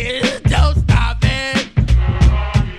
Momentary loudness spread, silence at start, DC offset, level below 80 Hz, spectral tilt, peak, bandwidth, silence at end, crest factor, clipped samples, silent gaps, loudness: 4 LU; 0 s; under 0.1%; -18 dBFS; -5.5 dB/octave; 0 dBFS; 11 kHz; 0 s; 14 dB; under 0.1%; none; -16 LUFS